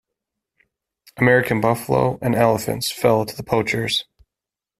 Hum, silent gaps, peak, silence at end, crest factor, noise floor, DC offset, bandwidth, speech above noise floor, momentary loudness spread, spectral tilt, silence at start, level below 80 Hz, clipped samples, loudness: none; none; -2 dBFS; 0.75 s; 18 dB; -88 dBFS; under 0.1%; 16 kHz; 69 dB; 6 LU; -5 dB/octave; 1.15 s; -52 dBFS; under 0.1%; -19 LUFS